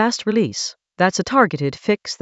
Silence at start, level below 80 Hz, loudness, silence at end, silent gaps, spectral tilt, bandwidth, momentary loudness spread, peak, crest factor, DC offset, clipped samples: 0 s; -58 dBFS; -19 LUFS; 0.05 s; none; -4.5 dB/octave; 8.2 kHz; 7 LU; 0 dBFS; 20 dB; under 0.1%; under 0.1%